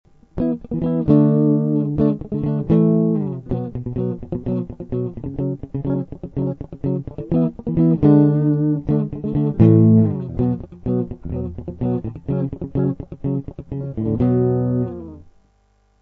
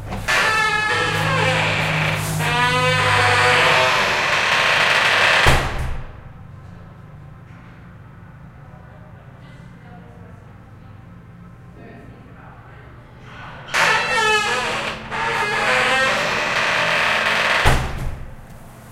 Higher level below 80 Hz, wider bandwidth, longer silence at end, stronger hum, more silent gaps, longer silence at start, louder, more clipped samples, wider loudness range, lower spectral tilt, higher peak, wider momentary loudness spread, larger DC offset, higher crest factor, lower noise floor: second, -40 dBFS vs -34 dBFS; second, 3.8 kHz vs 16 kHz; first, 0.8 s vs 0 s; neither; neither; first, 0.35 s vs 0 s; second, -20 LUFS vs -16 LUFS; neither; about the same, 9 LU vs 8 LU; first, -13 dB/octave vs -3 dB/octave; about the same, -2 dBFS vs 0 dBFS; about the same, 13 LU vs 12 LU; neither; about the same, 18 dB vs 20 dB; first, -59 dBFS vs -41 dBFS